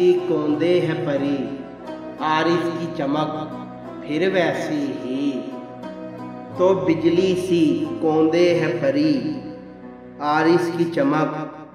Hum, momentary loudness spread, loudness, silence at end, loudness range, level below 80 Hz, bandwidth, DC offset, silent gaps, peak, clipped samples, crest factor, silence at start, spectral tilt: none; 16 LU; -21 LUFS; 0.05 s; 5 LU; -58 dBFS; 11.5 kHz; under 0.1%; none; -6 dBFS; under 0.1%; 16 dB; 0 s; -6.5 dB/octave